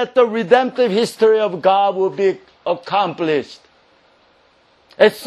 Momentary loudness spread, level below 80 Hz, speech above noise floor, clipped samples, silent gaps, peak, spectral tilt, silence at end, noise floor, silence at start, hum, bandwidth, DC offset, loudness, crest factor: 8 LU; -66 dBFS; 39 dB; under 0.1%; none; 0 dBFS; -5 dB/octave; 0 s; -55 dBFS; 0 s; none; 13 kHz; under 0.1%; -17 LUFS; 18 dB